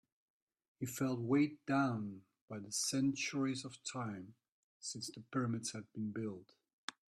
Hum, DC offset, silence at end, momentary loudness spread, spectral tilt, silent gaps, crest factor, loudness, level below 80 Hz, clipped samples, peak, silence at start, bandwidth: none; under 0.1%; 0.2 s; 15 LU; -4.5 dB/octave; 2.41-2.48 s, 4.52-4.80 s, 6.73-6.88 s; 20 dB; -39 LUFS; -80 dBFS; under 0.1%; -20 dBFS; 0.8 s; 13.5 kHz